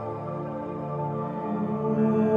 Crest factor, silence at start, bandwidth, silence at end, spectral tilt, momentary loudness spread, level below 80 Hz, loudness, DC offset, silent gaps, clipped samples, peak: 16 dB; 0 s; 3.8 kHz; 0 s; -10.5 dB/octave; 9 LU; -62 dBFS; -29 LUFS; under 0.1%; none; under 0.1%; -10 dBFS